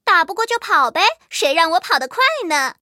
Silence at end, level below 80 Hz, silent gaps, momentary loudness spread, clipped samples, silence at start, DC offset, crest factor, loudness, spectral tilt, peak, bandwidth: 0.1 s; -68 dBFS; none; 4 LU; under 0.1%; 0.05 s; under 0.1%; 18 dB; -16 LUFS; 0.5 dB/octave; 0 dBFS; 16.5 kHz